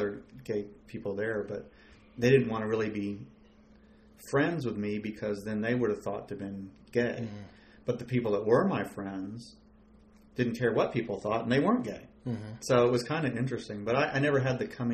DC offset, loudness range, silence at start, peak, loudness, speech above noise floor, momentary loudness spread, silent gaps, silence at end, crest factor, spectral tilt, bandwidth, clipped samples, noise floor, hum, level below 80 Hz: under 0.1%; 4 LU; 0 s; -10 dBFS; -31 LUFS; 28 dB; 15 LU; none; 0 s; 20 dB; -6.5 dB/octave; 14 kHz; under 0.1%; -58 dBFS; none; -62 dBFS